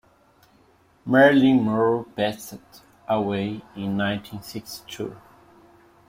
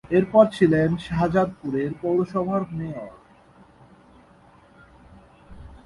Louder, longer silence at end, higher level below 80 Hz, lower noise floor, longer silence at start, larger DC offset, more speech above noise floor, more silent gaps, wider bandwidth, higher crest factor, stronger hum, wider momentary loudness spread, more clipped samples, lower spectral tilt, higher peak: about the same, -22 LUFS vs -22 LUFS; first, 0.9 s vs 0.1 s; second, -60 dBFS vs -50 dBFS; first, -58 dBFS vs -53 dBFS; first, 1.05 s vs 0.1 s; neither; first, 36 dB vs 31 dB; neither; first, 16 kHz vs 11.5 kHz; about the same, 20 dB vs 22 dB; neither; first, 21 LU vs 14 LU; neither; second, -6 dB/octave vs -8.5 dB/octave; about the same, -4 dBFS vs -2 dBFS